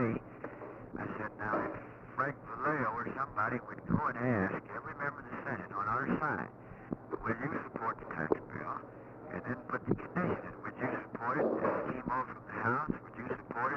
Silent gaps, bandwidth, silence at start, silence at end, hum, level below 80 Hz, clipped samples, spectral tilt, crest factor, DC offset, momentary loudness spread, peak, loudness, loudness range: none; 6.6 kHz; 0 s; 0 s; none; -62 dBFS; under 0.1%; -9.5 dB/octave; 22 dB; under 0.1%; 11 LU; -14 dBFS; -37 LUFS; 3 LU